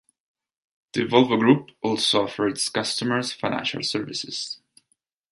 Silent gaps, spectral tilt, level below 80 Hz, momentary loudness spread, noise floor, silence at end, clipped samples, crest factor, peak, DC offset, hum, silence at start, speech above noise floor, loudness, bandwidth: none; -4 dB/octave; -64 dBFS; 11 LU; -72 dBFS; 0.75 s; under 0.1%; 22 dB; -4 dBFS; under 0.1%; none; 0.95 s; 49 dB; -23 LUFS; 11.5 kHz